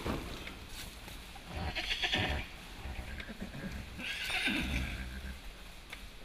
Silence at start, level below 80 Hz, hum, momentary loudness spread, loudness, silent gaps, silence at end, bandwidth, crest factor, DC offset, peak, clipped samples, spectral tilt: 0 s; -46 dBFS; none; 16 LU; -38 LUFS; none; 0 s; 15 kHz; 22 dB; under 0.1%; -18 dBFS; under 0.1%; -3.5 dB/octave